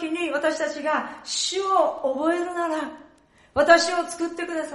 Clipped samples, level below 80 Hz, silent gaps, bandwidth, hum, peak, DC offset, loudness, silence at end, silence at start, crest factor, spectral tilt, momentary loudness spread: under 0.1%; -62 dBFS; none; 11.5 kHz; none; -2 dBFS; under 0.1%; -23 LUFS; 0 s; 0 s; 22 dB; -2 dB/octave; 12 LU